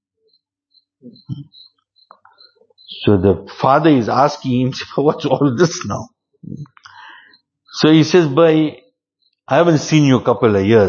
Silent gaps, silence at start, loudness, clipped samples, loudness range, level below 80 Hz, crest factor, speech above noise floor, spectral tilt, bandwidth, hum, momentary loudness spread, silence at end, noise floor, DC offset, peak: none; 1.05 s; -14 LUFS; under 0.1%; 6 LU; -54 dBFS; 16 dB; 53 dB; -6.5 dB/octave; 7.2 kHz; none; 20 LU; 0 s; -67 dBFS; under 0.1%; 0 dBFS